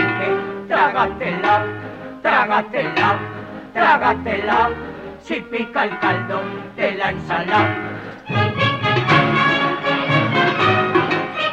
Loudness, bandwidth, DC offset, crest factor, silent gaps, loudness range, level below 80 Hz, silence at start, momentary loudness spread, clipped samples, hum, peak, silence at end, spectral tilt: -18 LUFS; 9 kHz; under 0.1%; 18 dB; none; 4 LU; -48 dBFS; 0 s; 12 LU; under 0.1%; none; -2 dBFS; 0 s; -6.5 dB/octave